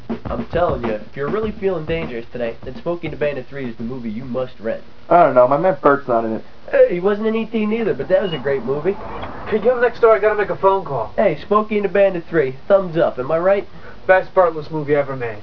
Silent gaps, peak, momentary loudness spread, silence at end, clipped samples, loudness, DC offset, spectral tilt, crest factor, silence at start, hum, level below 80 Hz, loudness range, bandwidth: none; 0 dBFS; 13 LU; 0 s; under 0.1%; -18 LUFS; 3%; -8.5 dB/octave; 18 dB; 0 s; none; -44 dBFS; 8 LU; 5.4 kHz